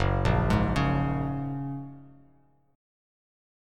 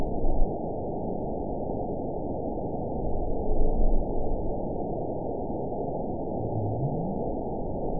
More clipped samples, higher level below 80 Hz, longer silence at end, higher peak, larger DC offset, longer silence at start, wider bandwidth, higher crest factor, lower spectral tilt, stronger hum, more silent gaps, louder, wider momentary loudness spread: neither; second, -38 dBFS vs -30 dBFS; first, 1.65 s vs 0 s; about the same, -10 dBFS vs -10 dBFS; second, under 0.1% vs 1%; about the same, 0 s vs 0 s; first, 11 kHz vs 1 kHz; about the same, 18 dB vs 16 dB; second, -7.5 dB/octave vs -17.5 dB/octave; neither; neither; first, -27 LUFS vs -32 LUFS; first, 13 LU vs 3 LU